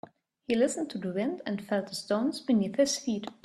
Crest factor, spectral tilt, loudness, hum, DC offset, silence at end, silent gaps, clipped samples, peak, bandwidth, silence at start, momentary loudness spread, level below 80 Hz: 16 dB; -4.5 dB/octave; -30 LUFS; none; under 0.1%; 0.1 s; none; under 0.1%; -14 dBFS; 13.5 kHz; 0.5 s; 7 LU; -72 dBFS